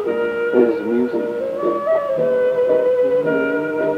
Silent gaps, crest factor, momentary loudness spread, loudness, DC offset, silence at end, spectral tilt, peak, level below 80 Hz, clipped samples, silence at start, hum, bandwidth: none; 14 dB; 5 LU; -18 LUFS; under 0.1%; 0 s; -7.5 dB/octave; -2 dBFS; -60 dBFS; under 0.1%; 0 s; none; 5.6 kHz